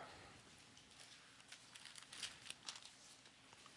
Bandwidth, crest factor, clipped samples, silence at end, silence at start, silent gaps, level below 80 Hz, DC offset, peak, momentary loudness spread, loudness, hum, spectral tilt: 12 kHz; 30 dB; under 0.1%; 0 s; 0 s; none; -84 dBFS; under 0.1%; -28 dBFS; 12 LU; -56 LUFS; none; -0.5 dB/octave